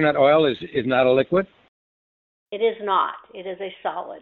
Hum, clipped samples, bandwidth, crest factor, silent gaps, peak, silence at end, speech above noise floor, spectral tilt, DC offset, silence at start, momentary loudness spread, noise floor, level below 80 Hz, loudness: none; under 0.1%; 4.5 kHz; 18 dB; 1.68-2.46 s; -4 dBFS; 0 s; over 69 dB; -8.5 dB/octave; under 0.1%; 0 s; 18 LU; under -90 dBFS; -60 dBFS; -21 LUFS